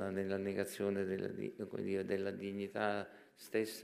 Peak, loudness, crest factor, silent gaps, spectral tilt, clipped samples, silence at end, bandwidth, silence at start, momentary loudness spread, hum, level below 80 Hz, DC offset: -20 dBFS; -40 LUFS; 20 dB; none; -5.5 dB/octave; under 0.1%; 0 s; 15.5 kHz; 0 s; 6 LU; none; -82 dBFS; under 0.1%